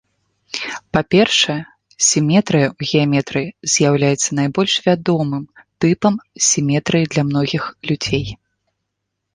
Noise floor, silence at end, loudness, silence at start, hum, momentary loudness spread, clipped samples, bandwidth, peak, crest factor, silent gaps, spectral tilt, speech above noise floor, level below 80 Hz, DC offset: -76 dBFS; 1 s; -17 LUFS; 0.55 s; none; 9 LU; under 0.1%; 10.5 kHz; -2 dBFS; 16 dB; none; -4 dB/octave; 60 dB; -50 dBFS; under 0.1%